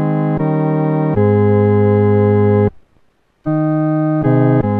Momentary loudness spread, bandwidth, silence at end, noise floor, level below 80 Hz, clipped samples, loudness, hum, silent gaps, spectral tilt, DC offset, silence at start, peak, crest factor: 4 LU; 3.9 kHz; 0 s; -55 dBFS; -44 dBFS; under 0.1%; -14 LUFS; none; none; -12.5 dB/octave; under 0.1%; 0 s; -2 dBFS; 12 dB